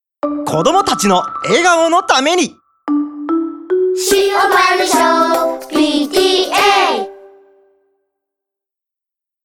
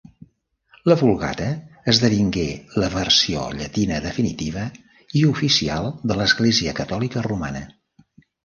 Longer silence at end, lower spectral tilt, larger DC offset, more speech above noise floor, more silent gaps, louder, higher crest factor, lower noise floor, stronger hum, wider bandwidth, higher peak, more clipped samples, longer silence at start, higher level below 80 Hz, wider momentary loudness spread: first, 2.15 s vs 0.75 s; second, -3 dB/octave vs -4.5 dB/octave; neither; first, 72 dB vs 39 dB; neither; first, -13 LUFS vs -20 LUFS; second, 14 dB vs 20 dB; first, -85 dBFS vs -59 dBFS; neither; first, 19.5 kHz vs 10 kHz; about the same, 0 dBFS vs 0 dBFS; neither; second, 0.25 s vs 0.85 s; second, -52 dBFS vs -42 dBFS; second, 8 LU vs 11 LU